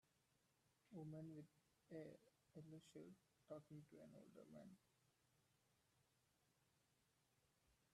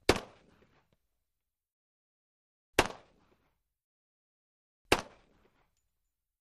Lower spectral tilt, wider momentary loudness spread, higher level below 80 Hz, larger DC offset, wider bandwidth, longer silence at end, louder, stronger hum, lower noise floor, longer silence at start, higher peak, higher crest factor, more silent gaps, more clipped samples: first, -7 dB/octave vs -3.5 dB/octave; second, 8 LU vs 18 LU; second, under -90 dBFS vs -54 dBFS; neither; second, 13 kHz vs 15 kHz; second, 0.05 s vs 1.35 s; second, -62 LUFS vs -32 LUFS; neither; second, -85 dBFS vs -89 dBFS; about the same, 0.05 s vs 0.1 s; second, -46 dBFS vs -8 dBFS; second, 20 dB vs 32 dB; second, none vs 1.72-2.73 s, 3.84-4.85 s; neither